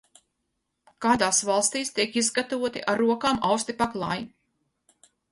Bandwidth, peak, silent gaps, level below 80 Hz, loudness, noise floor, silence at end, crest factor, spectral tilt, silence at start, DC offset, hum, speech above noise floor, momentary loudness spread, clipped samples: 11.5 kHz; -8 dBFS; none; -60 dBFS; -25 LUFS; -79 dBFS; 1.05 s; 20 dB; -2.5 dB/octave; 1 s; under 0.1%; none; 54 dB; 8 LU; under 0.1%